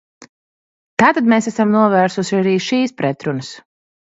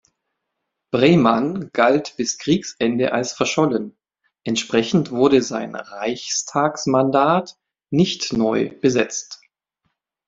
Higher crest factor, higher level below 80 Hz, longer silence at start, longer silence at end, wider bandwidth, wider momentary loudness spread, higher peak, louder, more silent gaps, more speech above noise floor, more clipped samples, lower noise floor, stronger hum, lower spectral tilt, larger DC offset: about the same, 16 dB vs 18 dB; about the same, -62 dBFS vs -58 dBFS; second, 0.2 s vs 0.95 s; second, 0.55 s vs 0.9 s; about the same, 8 kHz vs 7.8 kHz; about the same, 11 LU vs 10 LU; about the same, 0 dBFS vs -2 dBFS; first, -16 LUFS vs -19 LUFS; first, 0.29-0.97 s vs none; first, over 75 dB vs 60 dB; neither; first, under -90 dBFS vs -78 dBFS; neither; about the same, -5.5 dB/octave vs -4.5 dB/octave; neither